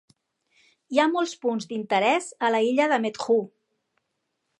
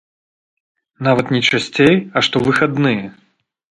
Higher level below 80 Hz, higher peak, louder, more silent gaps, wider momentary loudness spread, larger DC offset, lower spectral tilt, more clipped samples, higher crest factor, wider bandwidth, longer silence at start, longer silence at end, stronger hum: second, -82 dBFS vs -52 dBFS; second, -6 dBFS vs 0 dBFS; second, -24 LUFS vs -15 LUFS; neither; about the same, 6 LU vs 7 LU; neither; second, -4 dB/octave vs -5.5 dB/octave; neither; about the same, 18 dB vs 18 dB; about the same, 11 kHz vs 11.5 kHz; about the same, 0.9 s vs 1 s; first, 1.15 s vs 0.7 s; neither